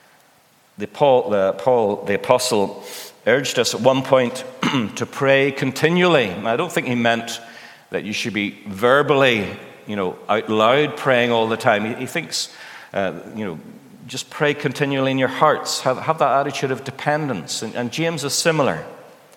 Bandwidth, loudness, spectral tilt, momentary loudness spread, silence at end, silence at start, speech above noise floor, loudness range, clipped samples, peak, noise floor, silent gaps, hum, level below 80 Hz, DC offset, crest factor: 18 kHz; -19 LUFS; -4 dB/octave; 13 LU; 0.3 s; 0.8 s; 36 dB; 4 LU; under 0.1%; 0 dBFS; -55 dBFS; none; none; -68 dBFS; under 0.1%; 20 dB